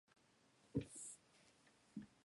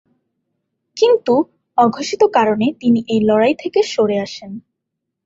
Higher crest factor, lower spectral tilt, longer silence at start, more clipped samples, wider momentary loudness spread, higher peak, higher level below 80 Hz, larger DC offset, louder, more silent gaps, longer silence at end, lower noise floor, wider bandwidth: first, 26 dB vs 16 dB; about the same, -5.5 dB/octave vs -5.5 dB/octave; second, 0.65 s vs 0.95 s; neither; second, 11 LU vs 14 LU; second, -30 dBFS vs -2 dBFS; second, -74 dBFS vs -58 dBFS; neither; second, -52 LUFS vs -16 LUFS; neither; second, 0.15 s vs 0.65 s; about the same, -75 dBFS vs -78 dBFS; first, 11.5 kHz vs 7.8 kHz